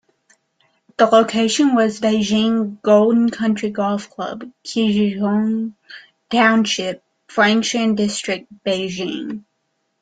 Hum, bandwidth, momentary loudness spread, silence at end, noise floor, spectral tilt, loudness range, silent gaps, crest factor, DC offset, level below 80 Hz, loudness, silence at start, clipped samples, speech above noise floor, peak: none; 9.4 kHz; 14 LU; 0.6 s; -70 dBFS; -4.5 dB/octave; 4 LU; none; 16 dB; under 0.1%; -60 dBFS; -18 LUFS; 1 s; under 0.1%; 53 dB; -2 dBFS